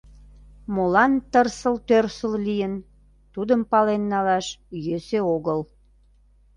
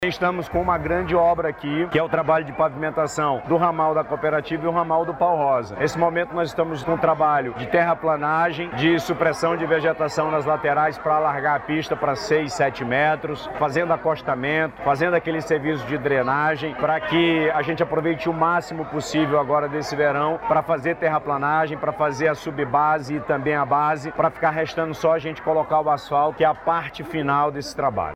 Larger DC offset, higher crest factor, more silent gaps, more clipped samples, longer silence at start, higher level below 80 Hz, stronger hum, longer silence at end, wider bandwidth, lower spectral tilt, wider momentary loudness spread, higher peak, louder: neither; about the same, 20 dB vs 16 dB; neither; neither; first, 0.7 s vs 0 s; about the same, -52 dBFS vs -50 dBFS; first, 50 Hz at -50 dBFS vs none; first, 0.95 s vs 0 s; second, 11 kHz vs 14.5 kHz; about the same, -6 dB/octave vs -6 dB/octave; first, 13 LU vs 5 LU; about the same, -4 dBFS vs -6 dBFS; about the same, -23 LUFS vs -22 LUFS